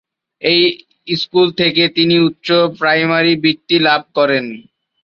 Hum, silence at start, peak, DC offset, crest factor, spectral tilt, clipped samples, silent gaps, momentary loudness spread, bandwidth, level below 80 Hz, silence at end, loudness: none; 0.4 s; 0 dBFS; under 0.1%; 14 dB; -6.5 dB/octave; under 0.1%; none; 8 LU; 6.6 kHz; -58 dBFS; 0.4 s; -13 LUFS